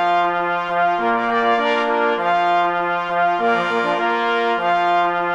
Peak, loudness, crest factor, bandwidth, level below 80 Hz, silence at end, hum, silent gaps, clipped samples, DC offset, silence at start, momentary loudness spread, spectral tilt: -4 dBFS; -18 LUFS; 14 dB; 8.2 kHz; -60 dBFS; 0 s; none; none; under 0.1%; under 0.1%; 0 s; 2 LU; -5 dB/octave